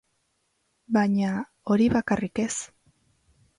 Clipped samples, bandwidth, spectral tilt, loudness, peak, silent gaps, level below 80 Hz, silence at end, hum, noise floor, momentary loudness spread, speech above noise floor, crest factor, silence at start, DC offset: under 0.1%; 11 kHz; -5.5 dB/octave; -25 LUFS; -12 dBFS; none; -54 dBFS; 0.9 s; none; -73 dBFS; 11 LU; 49 dB; 16 dB; 0.9 s; under 0.1%